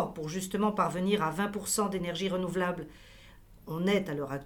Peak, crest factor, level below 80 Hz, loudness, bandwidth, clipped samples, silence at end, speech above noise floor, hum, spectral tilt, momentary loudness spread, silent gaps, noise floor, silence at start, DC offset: -12 dBFS; 20 dB; -56 dBFS; -31 LUFS; 19.5 kHz; under 0.1%; 0 s; 23 dB; none; -4.5 dB/octave; 7 LU; none; -54 dBFS; 0 s; under 0.1%